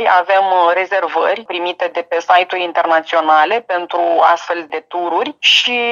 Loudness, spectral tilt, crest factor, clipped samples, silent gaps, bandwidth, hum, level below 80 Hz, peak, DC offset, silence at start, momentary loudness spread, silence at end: -14 LUFS; -1 dB/octave; 14 dB; under 0.1%; none; 7.6 kHz; none; -70 dBFS; 0 dBFS; under 0.1%; 0 s; 9 LU; 0 s